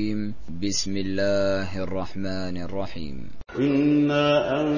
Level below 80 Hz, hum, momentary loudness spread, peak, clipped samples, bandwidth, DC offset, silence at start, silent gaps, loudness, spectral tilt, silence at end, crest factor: -46 dBFS; none; 14 LU; -10 dBFS; under 0.1%; 7.4 kHz; under 0.1%; 0 s; none; -25 LUFS; -5 dB/octave; 0 s; 14 dB